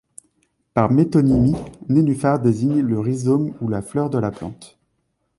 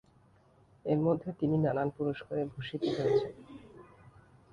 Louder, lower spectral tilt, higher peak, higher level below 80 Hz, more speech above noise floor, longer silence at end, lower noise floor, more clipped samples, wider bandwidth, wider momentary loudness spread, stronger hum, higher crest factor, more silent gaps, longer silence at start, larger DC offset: first, -19 LUFS vs -32 LUFS; about the same, -8.5 dB/octave vs -8.5 dB/octave; first, -2 dBFS vs -16 dBFS; first, -44 dBFS vs -64 dBFS; first, 52 dB vs 32 dB; about the same, 0.7 s vs 0.7 s; first, -70 dBFS vs -64 dBFS; neither; first, 11.5 kHz vs 9.8 kHz; second, 10 LU vs 13 LU; neither; about the same, 18 dB vs 18 dB; neither; about the same, 0.75 s vs 0.85 s; neither